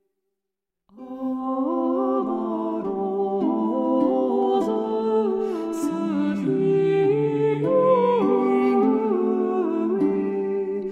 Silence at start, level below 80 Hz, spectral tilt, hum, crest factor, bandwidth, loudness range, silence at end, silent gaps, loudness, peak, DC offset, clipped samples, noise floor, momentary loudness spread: 0.95 s; -66 dBFS; -8 dB/octave; none; 14 dB; 10 kHz; 5 LU; 0 s; none; -22 LUFS; -8 dBFS; under 0.1%; under 0.1%; -85 dBFS; 7 LU